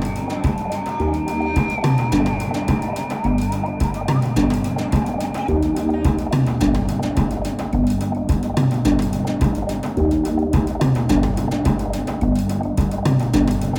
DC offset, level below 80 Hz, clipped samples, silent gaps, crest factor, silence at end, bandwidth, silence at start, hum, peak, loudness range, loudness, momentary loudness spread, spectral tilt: under 0.1%; -26 dBFS; under 0.1%; none; 14 dB; 0 s; 18.5 kHz; 0 s; none; -4 dBFS; 1 LU; -20 LUFS; 5 LU; -7.5 dB/octave